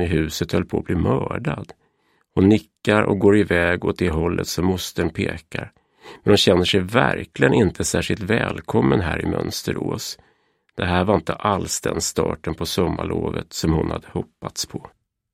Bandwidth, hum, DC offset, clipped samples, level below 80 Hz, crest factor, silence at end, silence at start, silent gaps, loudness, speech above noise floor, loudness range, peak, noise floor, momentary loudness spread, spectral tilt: 16 kHz; none; under 0.1%; under 0.1%; -40 dBFS; 20 dB; 0.45 s; 0 s; none; -21 LUFS; 44 dB; 4 LU; 0 dBFS; -65 dBFS; 12 LU; -5 dB/octave